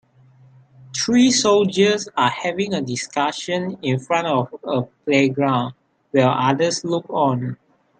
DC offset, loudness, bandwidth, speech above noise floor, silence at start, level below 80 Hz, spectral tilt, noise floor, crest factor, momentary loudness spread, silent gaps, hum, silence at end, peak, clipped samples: under 0.1%; -19 LUFS; 9.4 kHz; 32 dB; 0.8 s; -64 dBFS; -4.5 dB/octave; -51 dBFS; 16 dB; 9 LU; none; none; 0.45 s; -4 dBFS; under 0.1%